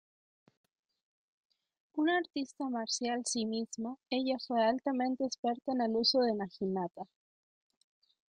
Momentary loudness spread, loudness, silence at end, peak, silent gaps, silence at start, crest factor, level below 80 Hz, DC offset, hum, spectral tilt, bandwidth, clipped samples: 11 LU; -33 LUFS; 1.25 s; -18 dBFS; 5.38-5.43 s; 1.95 s; 18 dB; -78 dBFS; under 0.1%; none; -3.5 dB/octave; 10.5 kHz; under 0.1%